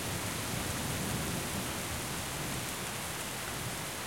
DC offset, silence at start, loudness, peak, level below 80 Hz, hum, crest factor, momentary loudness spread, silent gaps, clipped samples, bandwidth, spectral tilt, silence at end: 0.1%; 0 s; -35 LUFS; -22 dBFS; -52 dBFS; none; 14 dB; 3 LU; none; under 0.1%; 16.5 kHz; -3 dB/octave; 0 s